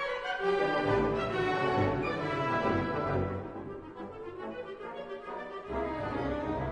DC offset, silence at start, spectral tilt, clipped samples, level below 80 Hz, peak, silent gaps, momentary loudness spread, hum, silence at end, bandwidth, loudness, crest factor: under 0.1%; 0 s; -7 dB/octave; under 0.1%; -50 dBFS; -16 dBFS; none; 13 LU; none; 0 s; 9.8 kHz; -32 LUFS; 16 dB